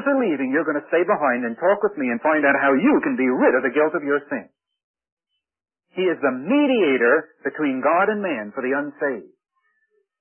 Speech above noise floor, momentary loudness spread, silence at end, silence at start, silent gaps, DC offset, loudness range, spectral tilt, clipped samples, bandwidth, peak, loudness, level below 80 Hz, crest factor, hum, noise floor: 48 dB; 9 LU; 0.95 s; 0 s; 4.84-4.94 s, 5.12-5.17 s; under 0.1%; 4 LU; -10.5 dB/octave; under 0.1%; 3.3 kHz; -4 dBFS; -20 LUFS; -74 dBFS; 18 dB; none; -68 dBFS